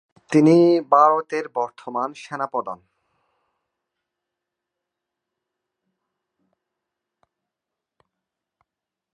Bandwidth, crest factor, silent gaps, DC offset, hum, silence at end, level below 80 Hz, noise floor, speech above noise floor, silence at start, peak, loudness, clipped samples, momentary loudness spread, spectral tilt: 10 kHz; 22 dB; none; under 0.1%; none; 6.4 s; -78 dBFS; -85 dBFS; 67 dB; 0.3 s; -2 dBFS; -19 LUFS; under 0.1%; 15 LU; -7.5 dB/octave